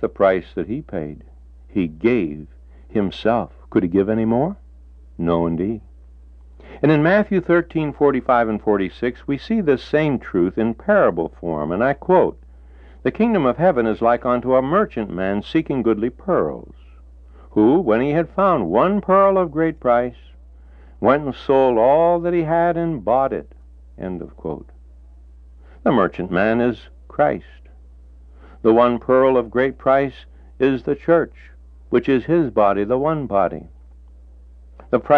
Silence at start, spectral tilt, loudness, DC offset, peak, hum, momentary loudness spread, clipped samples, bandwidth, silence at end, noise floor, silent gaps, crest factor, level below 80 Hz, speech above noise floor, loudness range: 0 s; -9.5 dB/octave; -19 LUFS; under 0.1%; -2 dBFS; none; 11 LU; under 0.1%; 6.2 kHz; 0 s; -43 dBFS; none; 18 dB; -42 dBFS; 25 dB; 4 LU